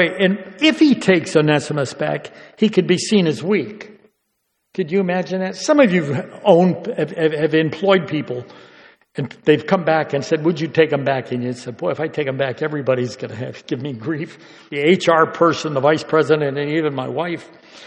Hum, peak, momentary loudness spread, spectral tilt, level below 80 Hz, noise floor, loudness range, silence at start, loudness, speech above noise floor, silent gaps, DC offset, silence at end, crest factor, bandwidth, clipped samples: none; 0 dBFS; 13 LU; -6 dB/octave; -64 dBFS; -71 dBFS; 4 LU; 0 s; -18 LUFS; 53 dB; none; under 0.1%; 0 s; 18 dB; 10.5 kHz; under 0.1%